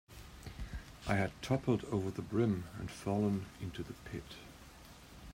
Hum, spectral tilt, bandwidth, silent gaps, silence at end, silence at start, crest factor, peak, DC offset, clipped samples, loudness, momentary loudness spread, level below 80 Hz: none; -7 dB/octave; 16 kHz; none; 0 s; 0.1 s; 20 dB; -18 dBFS; under 0.1%; under 0.1%; -38 LUFS; 20 LU; -54 dBFS